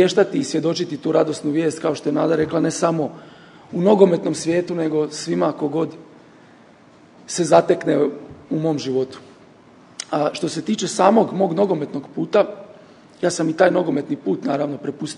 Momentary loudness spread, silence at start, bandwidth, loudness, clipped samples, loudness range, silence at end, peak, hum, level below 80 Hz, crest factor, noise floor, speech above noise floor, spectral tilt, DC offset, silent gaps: 12 LU; 0 s; 11 kHz; -20 LUFS; under 0.1%; 3 LU; 0 s; 0 dBFS; none; -64 dBFS; 20 dB; -48 dBFS; 29 dB; -5.5 dB/octave; under 0.1%; none